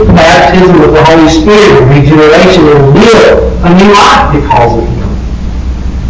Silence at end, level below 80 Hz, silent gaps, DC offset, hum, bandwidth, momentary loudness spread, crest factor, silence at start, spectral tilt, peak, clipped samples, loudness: 0 s; -16 dBFS; none; under 0.1%; none; 8 kHz; 13 LU; 4 dB; 0 s; -6 dB/octave; 0 dBFS; 20%; -3 LUFS